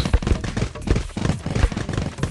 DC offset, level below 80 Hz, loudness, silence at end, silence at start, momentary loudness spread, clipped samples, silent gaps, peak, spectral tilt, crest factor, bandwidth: under 0.1%; -26 dBFS; -24 LUFS; 0 s; 0 s; 4 LU; under 0.1%; none; -4 dBFS; -6 dB/octave; 18 dB; 11.5 kHz